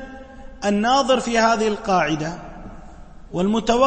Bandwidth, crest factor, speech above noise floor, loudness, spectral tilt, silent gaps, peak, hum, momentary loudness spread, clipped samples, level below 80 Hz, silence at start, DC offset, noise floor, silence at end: 8.8 kHz; 18 dB; 21 dB; -20 LUFS; -4.5 dB/octave; none; -4 dBFS; none; 21 LU; under 0.1%; -42 dBFS; 0 s; under 0.1%; -39 dBFS; 0 s